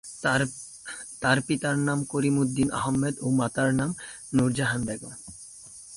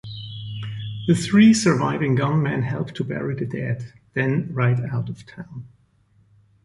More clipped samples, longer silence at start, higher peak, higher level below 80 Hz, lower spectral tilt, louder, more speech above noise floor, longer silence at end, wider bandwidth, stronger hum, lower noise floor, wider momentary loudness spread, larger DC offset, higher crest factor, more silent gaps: neither; about the same, 0.05 s vs 0.05 s; second, -8 dBFS vs -4 dBFS; about the same, -54 dBFS vs -54 dBFS; about the same, -5 dB/octave vs -6 dB/octave; second, -26 LUFS vs -21 LUFS; second, 20 dB vs 39 dB; second, 0 s vs 1 s; about the same, 11.5 kHz vs 11.5 kHz; neither; second, -46 dBFS vs -59 dBFS; second, 15 LU vs 19 LU; neither; about the same, 18 dB vs 18 dB; neither